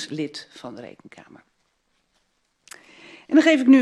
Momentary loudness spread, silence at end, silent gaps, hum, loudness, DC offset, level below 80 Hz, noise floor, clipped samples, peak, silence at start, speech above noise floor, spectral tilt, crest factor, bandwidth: 28 LU; 0 s; none; none; -19 LUFS; under 0.1%; -74 dBFS; -70 dBFS; under 0.1%; -4 dBFS; 0 s; 50 dB; -4.5 dB/octave; 18 dB; 10.5 kHz